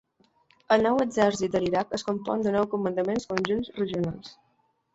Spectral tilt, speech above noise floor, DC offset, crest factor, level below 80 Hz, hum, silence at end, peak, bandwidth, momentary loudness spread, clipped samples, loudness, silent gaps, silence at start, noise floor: -5.5 dB/octave; 39 dB; under 0.1%; 22 dB; -58 dBFS; none; 0.6 s; -4 dBFS; 8 kHz; 7 LU; under 0.1%; -26 LUFS; none; 0.7 s; -65 dBFS